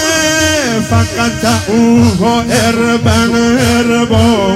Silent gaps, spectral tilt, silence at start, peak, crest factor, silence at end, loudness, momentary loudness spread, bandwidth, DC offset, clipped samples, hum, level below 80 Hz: none; -4.5 dB/octave; 0 s; 0 dBFS; 10 dB; 0 s; -10 LUFS; 4 LU; 16 kHz; under 0.1%; 0.4%; none; -34 dBFS